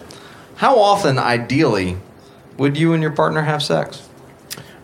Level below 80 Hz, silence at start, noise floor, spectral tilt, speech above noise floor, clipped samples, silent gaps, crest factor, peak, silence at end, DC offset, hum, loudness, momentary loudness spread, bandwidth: -54 dBFS; 0 s; -43 dBFS; -6 dB/octave; 27 dB; under 0.1%; none; 18 dB; 0 dBFS; 0.2 s; under 0.1%; none; -17 LUFS; 19 LU; 16 kHz